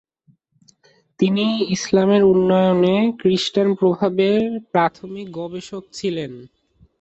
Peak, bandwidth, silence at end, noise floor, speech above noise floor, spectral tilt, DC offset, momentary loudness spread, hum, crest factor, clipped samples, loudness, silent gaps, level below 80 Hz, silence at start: -4 dBFS; 8.2 kHz; 0.55 s; -60 dBFS; 42 dB; -6 dB/octave; under 0.1%; 15 LU; none; 14 dB; under 0.1%; -18 LUFS; none; -58 dBFS; 1.2 s